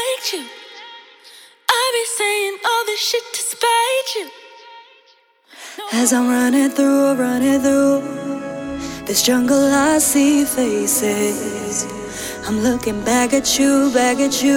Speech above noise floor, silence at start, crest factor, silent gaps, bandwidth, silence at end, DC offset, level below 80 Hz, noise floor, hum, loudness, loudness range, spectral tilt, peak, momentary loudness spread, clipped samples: 38 dB; 0 s; 18 dB; none; 17.5 kHz; 0 s; under 0.1%; -50 dBFS; -54 dBFS; none; -17 LUFS; 4 LU; -2.5 dB/octave; 0 dBFS; 13 LU; under 0.1%